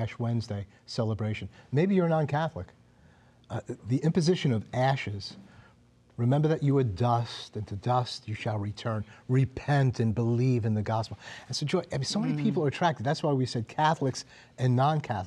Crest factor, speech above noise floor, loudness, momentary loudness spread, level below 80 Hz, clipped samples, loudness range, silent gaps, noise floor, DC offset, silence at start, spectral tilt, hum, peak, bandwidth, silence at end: 18 dB; 32 dB; -29 LUFS; 12 LU; -60 dBFS; under 0.1%; 2 LU; none; -60 dBFS; under 0.1%; 0 s; -6.5 dB/octave; none; -12 dBFS; 10.5 kHz; 0 s